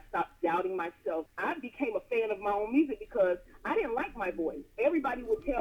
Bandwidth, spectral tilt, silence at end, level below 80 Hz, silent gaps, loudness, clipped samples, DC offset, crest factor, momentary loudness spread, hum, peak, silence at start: 14.5 kHz; -6.5 dB/octave; 0 s; -56 dBFS; none; -32 LUFS; under 0.1%; under 0.1%; 16 dB; 6 LU; none; -16 dBFS; 0.05 s